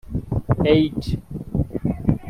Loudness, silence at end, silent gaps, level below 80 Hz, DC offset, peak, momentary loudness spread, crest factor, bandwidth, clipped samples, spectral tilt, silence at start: -22 LUFS; 0 s; none; -34 dBFS; under 0.1%; -2 dBFS; 10 LU; 18 dB; 14 kHz; under 0.1%; -8.5 dB/octave; 0.05 s